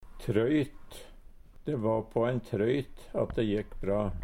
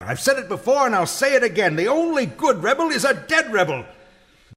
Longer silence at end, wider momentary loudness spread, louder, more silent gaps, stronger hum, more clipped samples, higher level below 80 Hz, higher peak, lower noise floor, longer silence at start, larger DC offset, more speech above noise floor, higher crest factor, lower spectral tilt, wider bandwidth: about the same, 0 s vs 0 s; first, 12 LU vs 4 LU; second, -31 LUFS vs -19 LUFS; neither; neither; neither; first, -46 dBFS vs -58 dBFS; second, -14 dBFS vs -4 dBFS; about the same, -50 dBFS vs -52 dBFS; about the same, 0 s vs 0 s; neither; second, 20 dB vs 33 dB; about the same, 18 dB vs 16 dB; first, -8 dB/octave vs -3.5 dB/octave; about the same, 16 kHz vs 16 kHz